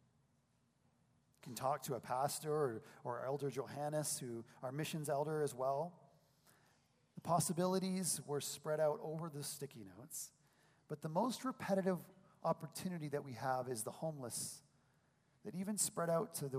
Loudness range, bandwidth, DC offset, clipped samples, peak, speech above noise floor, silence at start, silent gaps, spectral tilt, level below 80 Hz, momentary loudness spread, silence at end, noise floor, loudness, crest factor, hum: 3 LU; 15.5 kHz; under 0.1%; under 0.1%; -22 dBFS; 37 dB; 1.45 s; none; -4.5 dB/octave; -84 dBFS; 11 LU; 0 s; -78 dBFS; -41 LUFS; 20 dB; none